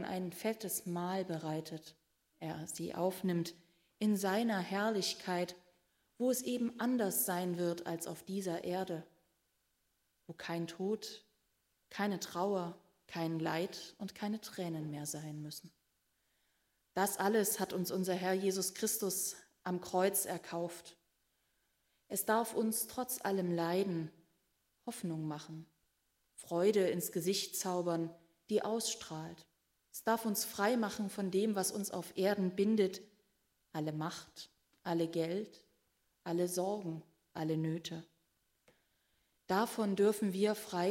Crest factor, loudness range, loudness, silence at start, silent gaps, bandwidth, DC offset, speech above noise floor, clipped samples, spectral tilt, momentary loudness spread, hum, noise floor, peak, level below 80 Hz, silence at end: 20 dB; 6 LU; -37 LUFS; 0 s; none; 16 kHz; under 0.1%; 44 dB; under 0.1%; -4.5 dB/octave; 14 LU; none; -80 dBFS; -18 dBFS; -80 dBFS; 0 s